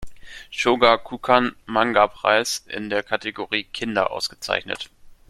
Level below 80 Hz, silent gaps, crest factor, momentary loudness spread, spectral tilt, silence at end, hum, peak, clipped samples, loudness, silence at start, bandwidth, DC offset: -52 dBFS; none; 22 dB; 14 LU; -3 dB/octave; 0.15 s; none; 0 dBFS; under 0.1%; -21 LUFS; 0 s; 14 kHz; under 0.1%